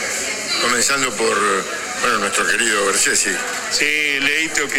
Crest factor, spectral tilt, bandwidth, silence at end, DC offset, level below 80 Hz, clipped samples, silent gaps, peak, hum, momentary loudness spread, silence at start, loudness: 18 dB; -0.5 dB/octave; 16.5 kHz; 0 s; under 0.1%; -52 dBFS; under 0.1%; none; -2 dBFS; none; 6 LU; 0 s; -16 LUFS